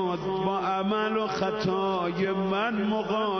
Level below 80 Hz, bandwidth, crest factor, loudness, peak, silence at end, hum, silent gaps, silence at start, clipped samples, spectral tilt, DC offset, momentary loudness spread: -58 dBFS; 6.4 kHz; 12 dB; -27 LUFS; -14 dBFS; 0 s; none; none; 0 s; under 0.1%; -6.5 dB/octave; under 0.1%; 2 LU